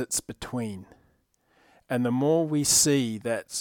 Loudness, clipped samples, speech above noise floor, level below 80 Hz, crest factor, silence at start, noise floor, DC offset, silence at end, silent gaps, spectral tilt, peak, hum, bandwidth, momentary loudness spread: -25 LUFS; under 0.1%; 42 dB; -58 dBFS; 18 dB; 0 s; -68 dBFS; under 0.1%; 0 s; none; -3.5 dB/octave; -8 dBFS; none; 19 kHz; 15 LU